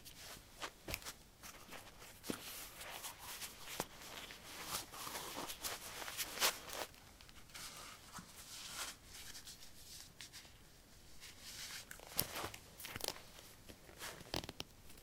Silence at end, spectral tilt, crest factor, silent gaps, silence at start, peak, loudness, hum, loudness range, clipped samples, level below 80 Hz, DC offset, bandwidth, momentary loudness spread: 0 s; -1.5 dB/octave; 38 dB; none; 0 s; -12 dBFS; -46 LUFS; none; 9 LU; under 0.1%; -66 dBFS; under 0.1%; 17 kHz; 14 LU